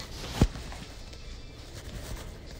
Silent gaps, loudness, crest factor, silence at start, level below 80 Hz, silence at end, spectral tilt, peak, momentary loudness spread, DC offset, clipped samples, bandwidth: none; -36 LUFS; 26 dB; 0 s; -38 dBFS; 0 s; -5.5 dB/octave; -8 dBFS; 16 LU; under 0.1%; under 0.1%; 16 kHz